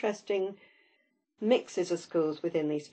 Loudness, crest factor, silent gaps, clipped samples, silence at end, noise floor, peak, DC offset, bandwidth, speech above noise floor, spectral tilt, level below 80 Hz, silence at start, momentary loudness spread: -31 LUFS; 18 dB; none; under 0.1%; 0.05 s; -73 dBFS; -14 dBFS; under 0.1%; 8.8 kHz; 43 dB; -5.5 dB/octave; -86 dBFS; 0 s; 5 LU